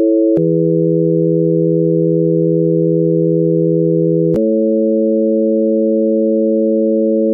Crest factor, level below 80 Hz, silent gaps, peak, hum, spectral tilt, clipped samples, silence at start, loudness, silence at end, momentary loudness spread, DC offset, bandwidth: 8 dB; -56 dBFS; none; -4 dBFS; none; -14 dB/octave; under 0.1%; 0 s; -13 LUFS; 0 s; 0 LU; under 0.1%; 1.4 kHz